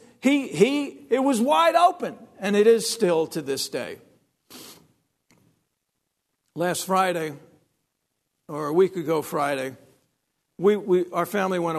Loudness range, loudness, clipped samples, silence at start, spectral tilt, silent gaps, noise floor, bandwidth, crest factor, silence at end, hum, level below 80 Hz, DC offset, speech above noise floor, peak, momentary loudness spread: 10 LU; -23 LUFS; under 0.1%; 0.25 s; -4.5 dB/octave; none; -79 dBFS; 13.5 kHz; 20 dB; 0 s; none; -76 dBFS; under 0.1%; 56 dB; -4 dBFS; 16 LU